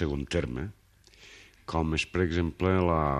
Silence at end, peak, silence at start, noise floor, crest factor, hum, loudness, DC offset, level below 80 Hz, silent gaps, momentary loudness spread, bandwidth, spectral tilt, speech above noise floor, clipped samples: 0 s; -10 dBFS; 0 s; -56 dBFS; 20 dB; none; -29 LUFS; under 0.1%; -42 dBFS; none; 19 LU; 11 kHz; -6.5 dB/octave; 28 dB; under 0.1%